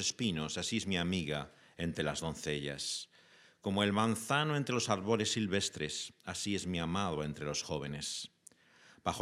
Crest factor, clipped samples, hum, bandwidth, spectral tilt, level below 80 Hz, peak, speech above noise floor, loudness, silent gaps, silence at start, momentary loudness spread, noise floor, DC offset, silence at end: 22 dB; under 0.1%; none; 15.5 kHz; -4 dB/octave; -64 dBFS; -14 dBFS; 28 dB; -35 LUFS; none; 0 s; 9 LU; -63 dBFS; under 0.1%; 0 s